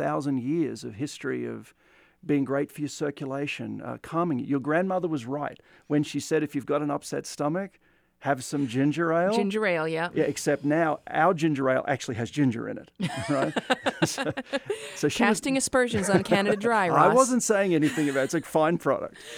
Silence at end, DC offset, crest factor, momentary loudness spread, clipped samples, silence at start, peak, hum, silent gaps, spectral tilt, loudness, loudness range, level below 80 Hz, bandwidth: 0 s; under 0.1%; 20 dB; 10 LU; under 0.1%; 0 s; -6 dBFS; none; none; -5 dB/octave; -26 LUFS; 7 LU; -64 dBFS; 18 kHz